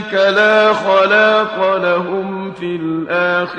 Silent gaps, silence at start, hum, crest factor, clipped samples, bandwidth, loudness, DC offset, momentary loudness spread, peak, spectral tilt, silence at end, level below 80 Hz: none; 0 s; none; 14 dB; under 0.1%; 9 kHz; -14 LUFS; under 0.1%; 11 LU; 0 dBFS; -5.5 dB/octave; 0 s; -58 dBFS